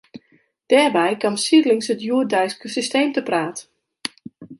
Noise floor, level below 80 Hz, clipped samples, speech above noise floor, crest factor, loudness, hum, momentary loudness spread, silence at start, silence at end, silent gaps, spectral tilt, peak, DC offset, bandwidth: -60 dBFS; -72 dBFS; under 0.1%; 42 dB; 18 dB; -19 LUFS; none; 15 LU; 0.15 s; 0.05 s; none; -3.5 dB/octave; -2 dBFS; under 0.1%; 11.5 kHz